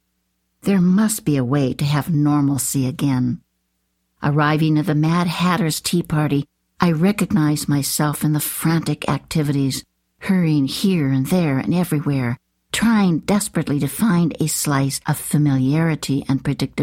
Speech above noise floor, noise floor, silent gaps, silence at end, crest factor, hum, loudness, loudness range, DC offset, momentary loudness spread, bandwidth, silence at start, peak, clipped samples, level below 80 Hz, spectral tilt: 52 dB; -70 dBFS; none; 0 s; 16 dB; none; -19 LUFS; 1 LU; under 0.1%; 5 LU; 16.5 kHz; 0.65 s; -4 dBFS; under 0.1%; -50 dBFS; -5.5 dB/octave